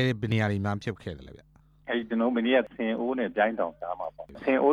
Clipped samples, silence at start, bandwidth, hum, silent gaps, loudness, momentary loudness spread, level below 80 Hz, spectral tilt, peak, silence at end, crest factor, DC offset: under 0.1%; 0 s; 10 kHz; none; none; -28 LUFS; 14 LU; -58 dBFS; -7.5 dB/octave; -10 dBFS; 0 s; 16 dB; under 0.1%